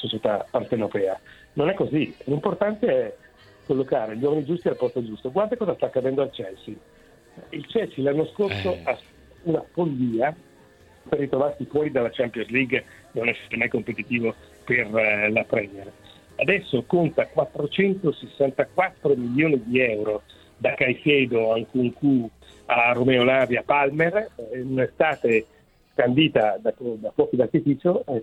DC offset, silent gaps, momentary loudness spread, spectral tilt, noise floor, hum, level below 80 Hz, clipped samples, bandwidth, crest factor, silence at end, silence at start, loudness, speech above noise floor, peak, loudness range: under 0.1%; none; 10 LU; -7.5 dB/octave; -53 dBFS; none; -58 dBFS; under 0.1%; 11.5 kHz; 20 dB; 0 s; 0 s; -23 LUFS; 30 dB; -4 dBFS; 6 LU